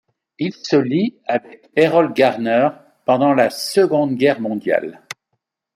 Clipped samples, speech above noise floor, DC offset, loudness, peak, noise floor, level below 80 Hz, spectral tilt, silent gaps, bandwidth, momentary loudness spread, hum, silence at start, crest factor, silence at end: under 0.1%; 57 dB; under 0.1%; -18 LUFS; -2 dBFS; -74 dBFS; -66 dBFS; -5.5 dB/octave; none; 15.5 kHz; 11 LU; none; 0.4 s; 16 dB; 0.85 s